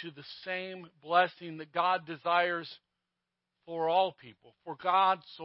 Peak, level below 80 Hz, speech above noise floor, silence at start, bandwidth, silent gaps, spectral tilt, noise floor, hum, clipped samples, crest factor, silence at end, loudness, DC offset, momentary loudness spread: -12 dBFS; -86 dBFS; 55 dB; 0 s; 5.6 kHz; none; -1 dB/octave; -87 dBFS; none; under 0.1%; 20 dB; 0 s; -30 LUFS; under 0.1%; 17 LU